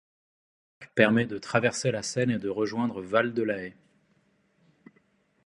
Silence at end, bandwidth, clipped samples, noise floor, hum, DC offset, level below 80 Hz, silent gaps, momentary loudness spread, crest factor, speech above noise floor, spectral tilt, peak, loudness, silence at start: 1.75 s; 11.5 kHz; under 0.1%; -68 dBFS; none; under 0.1%; -66 dBFS; none; 9 LU; 26 dB; 41 dB; -5 dB/octave; -4 dBFS; -27 LUFS; 0.8 s